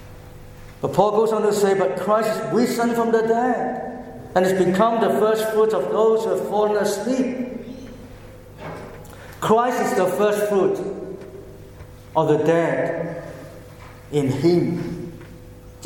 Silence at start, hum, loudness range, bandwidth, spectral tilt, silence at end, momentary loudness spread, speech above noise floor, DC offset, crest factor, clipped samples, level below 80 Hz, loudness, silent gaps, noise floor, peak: 0 s; none; 5 LU; 17.5 kHz; -6 dB/octave; 0 s; 21 LU; 22 dB; under 0.1%; 20 dB; under 0.1%; -50 dBFS; -20 LUFS; none; -41 dBFS; -2 dBFS